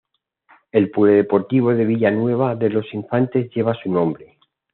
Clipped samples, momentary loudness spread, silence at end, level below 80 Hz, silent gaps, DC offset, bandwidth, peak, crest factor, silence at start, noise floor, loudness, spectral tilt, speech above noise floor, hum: under 0.1%; 7 LU; 0.5 s; -64 dBFS; none; under 0.1%; 4.2 kHz; -2 dBFS; 18 dB; 0.75 s; -57 dBFS; -19 LUFS; -7.5 dB/octave; 40 dB; none